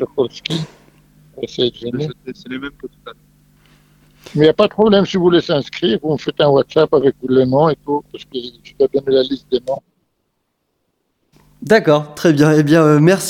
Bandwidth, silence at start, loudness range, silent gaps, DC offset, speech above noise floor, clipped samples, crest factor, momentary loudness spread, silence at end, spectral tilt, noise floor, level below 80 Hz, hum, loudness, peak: 16 kHz; 0 s; 11 LU; none; under 0.1%; 54 dB; under 0.1%; 16 dB; 17 LU; 0 s; -6 dB/octave; -69 dBFS; -52 dBFS; none; -15 LUFS; 0 dBFS